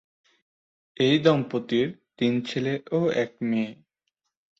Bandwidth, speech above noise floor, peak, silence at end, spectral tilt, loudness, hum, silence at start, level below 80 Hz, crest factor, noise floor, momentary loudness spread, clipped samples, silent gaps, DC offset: 7.8 kHz; 56 dB; -6 dBFS; 0.85 s; -6.5 dB/octave; -25 LUFS; none; 1 s; -66 dBFS; 22 dB; -80 dBFS; 8 LU; under 0.1%; none; under 0.1%